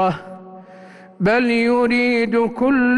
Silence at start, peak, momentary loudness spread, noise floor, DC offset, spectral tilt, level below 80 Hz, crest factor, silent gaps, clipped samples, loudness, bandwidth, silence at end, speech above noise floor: 0 s; -8 dBFS; 14 LU; -42 dBFS; under 0.1%; -6.5 dB/octave; -52 dBFS; 10 dB; none; under 0.1%; -17 LUFS; 11 kHz; 0 s; 25 dB